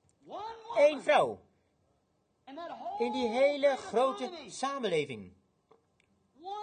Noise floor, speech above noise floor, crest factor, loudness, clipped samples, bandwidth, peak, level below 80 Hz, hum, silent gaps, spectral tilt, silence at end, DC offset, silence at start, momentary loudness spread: -75 dBFS; 45 dB; 20 dB; -30 LUFS; under 0.1%; 9.8 kHz; -12 dBFS; -74 dBFS; none; none; -4 dB/octave; 0 s; under 0.1%; 0.25 s; 19 LU